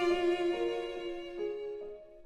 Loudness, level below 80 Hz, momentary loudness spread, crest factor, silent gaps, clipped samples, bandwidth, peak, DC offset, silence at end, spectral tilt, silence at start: -35 LUFS; -60 dBFS; 12 LU; 14 dB; none; under 0.1%; 9.6 kHz; -20 dBFS; under 0.1%; 0 s; -4.5 dB/octave; 0 s